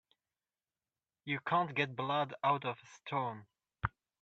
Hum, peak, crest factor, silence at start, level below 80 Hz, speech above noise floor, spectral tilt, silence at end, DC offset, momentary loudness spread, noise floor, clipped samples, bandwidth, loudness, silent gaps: none; -16 dBFS; 22 dB; 1.25 s; -64 dBFS; over 54 dB; -6 dB/octave; 0.35 s; under 0.1%; 10 LU; under -90 dBFS; under 0.1%; 8 kHz; -36 LUFS; none